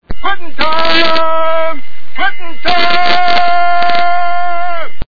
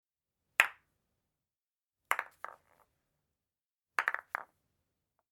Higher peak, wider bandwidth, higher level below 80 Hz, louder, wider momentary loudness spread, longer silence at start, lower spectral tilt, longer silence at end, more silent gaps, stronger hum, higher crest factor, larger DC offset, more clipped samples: first, 0 dBFS vs -4 dBFS; second, 5.4 kHz vs 18 kHz; first, -34 dBFS vs -88 dBFS; first, -13 LUFS vs -34 LUFS; second, 9 LU vs 18 LU; second, 0 s vs 0.6 s; first, -4.5 dB/octave vs 1.5 dB/octave; second, 0.05 s vs 0.9 s; second, none vs 3.74-3.79 s; neither; second, 16 dB vs 36 dB; first, 50% vs under 0.1%; first, 0.8% vs under 0.1%